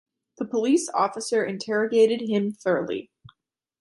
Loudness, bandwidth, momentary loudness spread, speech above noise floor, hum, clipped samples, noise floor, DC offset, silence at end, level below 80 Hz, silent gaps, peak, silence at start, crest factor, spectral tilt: -24 LUFS; 11.5 kHz; 9 LU; 49 dB; none; under 0.1%; -72 dBFS; under 0.1%; 0.8 s; -72 dBFS; none; -8 dBFS; 0.4 s; 16 dB; -4.5 dB/octave